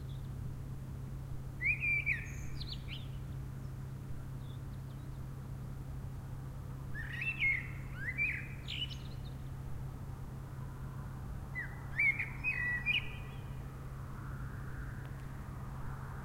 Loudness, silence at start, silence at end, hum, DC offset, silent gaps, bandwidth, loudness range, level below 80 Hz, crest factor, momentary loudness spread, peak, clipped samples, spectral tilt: -39 LUFS; 0 s; 0 s; none; under 0.1%; none; 16 kHz; 9 LU; -48 dBFS; 18 dB; 14 LU; -22 dBFS; under 0.1%; -5 dB/octave